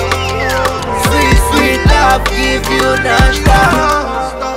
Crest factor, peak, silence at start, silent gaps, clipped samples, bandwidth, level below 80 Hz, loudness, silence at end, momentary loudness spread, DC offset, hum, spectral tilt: 10 dB; 0 dBFS; 0 s; none; under 0.1%; 16.5 kHz; -18 dBFS; -11 LUFS; 0 s; 6 LU; under 0.1%; none; -4.5 dB/octave